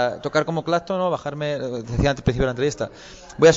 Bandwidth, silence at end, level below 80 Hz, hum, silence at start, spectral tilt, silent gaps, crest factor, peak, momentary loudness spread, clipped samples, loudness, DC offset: 8 kHz; 0 s; -38 dBFS; none; 0 s; -5.5 dB/octave; none; 16 dB; -4 dBFS; 9 LU; under 0.1%; -23 LUFS; under 0.1%